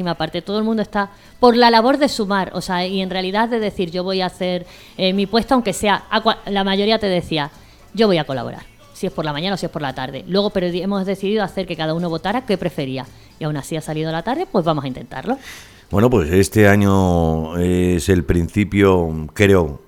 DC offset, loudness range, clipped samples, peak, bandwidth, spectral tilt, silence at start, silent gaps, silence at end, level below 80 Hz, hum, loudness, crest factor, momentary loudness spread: under 0.1%; 6 LU; under 0.1%; 0 dBFS; 17.5 kHz; -6 dB/octave; 0 s; none; 0.1 s; -38 dBFS; none; -18 LUFS; 18 dB; 12 LU